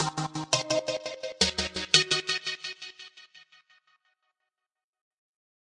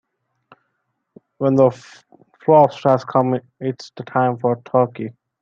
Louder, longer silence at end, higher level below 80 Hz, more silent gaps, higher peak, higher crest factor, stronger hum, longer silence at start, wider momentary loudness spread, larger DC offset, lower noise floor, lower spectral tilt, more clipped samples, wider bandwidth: second, -27 LUFS vs -18 LUFS; first, 2.25 s vs 0.3 s; first, -58 dBFS vs -64 dBFS; neither; about the same, -2 dBFS vs -2 dBFS; first, 30 dB vs 18 dB; neither; second, 0 s vs 1.4 s; first, 19 LU vs 16 LU; neither; first, -85 dBFS vs -73 dBFS; second, -2 dB/octave vs -8.5 dB/octave; neither; first, 11.5 kHz vs 7.6 kHz